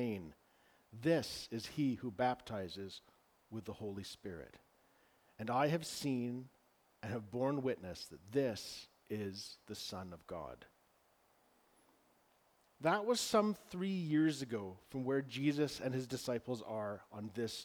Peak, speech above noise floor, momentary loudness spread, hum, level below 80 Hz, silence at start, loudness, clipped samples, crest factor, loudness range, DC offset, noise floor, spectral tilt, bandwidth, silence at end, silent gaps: -18 dBFS; 34 dB; 15 LU; none; -72 dBFS; 0 s; -40 LUFS; under 0.1%; 22 dB; 11 LU; under 0.1%; -73 dBFS; -5.5 dB/octave; over 20 kHz; 0 s; none